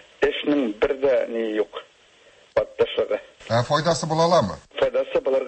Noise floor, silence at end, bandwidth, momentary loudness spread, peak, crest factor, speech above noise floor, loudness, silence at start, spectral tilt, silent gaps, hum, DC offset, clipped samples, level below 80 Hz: -54 dBFS; 0 s; 8.8 kHz; 8 LU; -8 dBFS; 16 dB; 33 dB; -23 LUFS; 0.2 s; -5 dB/octave; none; none; under 0.1%; under 0.1%; -52 dBFS